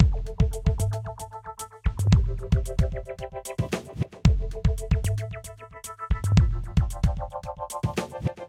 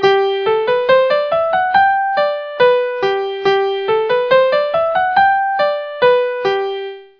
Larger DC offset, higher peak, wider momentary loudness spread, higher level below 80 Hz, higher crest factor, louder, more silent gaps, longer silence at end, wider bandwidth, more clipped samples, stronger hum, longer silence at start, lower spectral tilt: neither; about the same, -2 dBFS vs 0 dBFS; first, 15 LU vs 5 LU; first, -30 dBFS vs -56 dBFS; first, 24 dB vs 14 dB; second, -27 LUFS vs -15 LUFS; neither; second, 0 s vs 0.15 s; first, 15 kHz vs 5.4 kHz; neither; neither; about the same, 0 s vs 0 s; first, -6.5 dB/octave vs -5 dB/octave